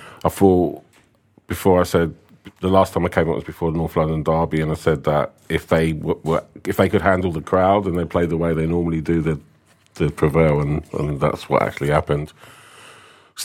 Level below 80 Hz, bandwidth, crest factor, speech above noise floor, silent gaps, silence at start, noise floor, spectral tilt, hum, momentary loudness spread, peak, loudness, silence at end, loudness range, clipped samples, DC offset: -40 dBFS; 16.5 kHz; 20 dB; 37 dB; none; 0 s; -56 dBFS; -7 dB/octave; none; 8 LU; 0 dBFS; -20 LUFS; 0 s; 1 LU; under 0.1%; under 0.1%